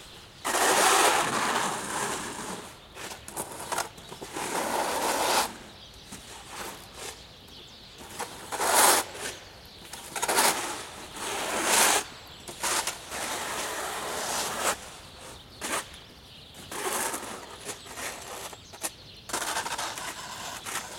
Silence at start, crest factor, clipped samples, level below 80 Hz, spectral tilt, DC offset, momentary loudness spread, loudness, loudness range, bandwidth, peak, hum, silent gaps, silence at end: 0 s; 24 dB; under 0.1%; -60 dBFS; -0.5 dB/octave; under 0.1%; 23 LU; -28 LUFS; 9 LU; 16.5 kHz; -6 dBFS; none; none; 0 s